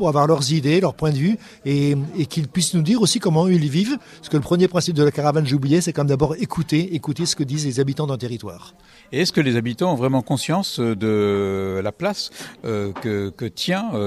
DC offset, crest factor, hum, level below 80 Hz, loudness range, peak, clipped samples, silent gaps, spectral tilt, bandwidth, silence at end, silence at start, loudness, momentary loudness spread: under 0.1%; 16 dB; none; -52 dBFS; 4 LU; -4 dBFS; under 0.1%; none; -5.5 dB/octave; 13 kHz; 0 s; 0 s; -20 LUFS; 8 LU